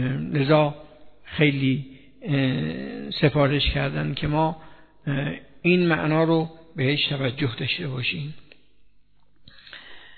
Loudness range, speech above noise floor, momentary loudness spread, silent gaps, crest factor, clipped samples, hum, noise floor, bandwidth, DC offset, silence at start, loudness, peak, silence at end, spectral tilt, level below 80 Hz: 4 LU; 38 dB; 17 LU; none; 18 dB; under 0.1%; 50 Hz at -45 dBFS; -61 dBFS; 4.6 kHz; 0.3%; 0 s; -23 LUFS; -6 dBFS; 0.2 s; -9.5 dB/octave; -44 dBFS